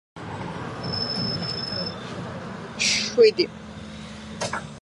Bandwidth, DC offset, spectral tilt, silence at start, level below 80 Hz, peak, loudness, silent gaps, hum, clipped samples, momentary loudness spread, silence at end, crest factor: 11.5 kHz; under 0.1%; -3.5 dB/octave; 0.15 s; -52 dBFS; -6 dBFS; -25 LUFS; none; none; under 0.1%; 20 LU; 0.05 s; 20 dB